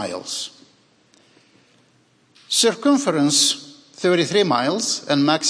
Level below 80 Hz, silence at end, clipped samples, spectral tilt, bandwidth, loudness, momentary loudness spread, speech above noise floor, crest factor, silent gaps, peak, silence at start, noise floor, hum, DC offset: -74 dBFS; 0 s; under 0.1%; -3 dB/octave; 11 kHz; -19 LUFS; 12 LU; 40 dB; 18 dB; none; -4 dBFS; 0 s; -59 dBFS; none; under 0.1%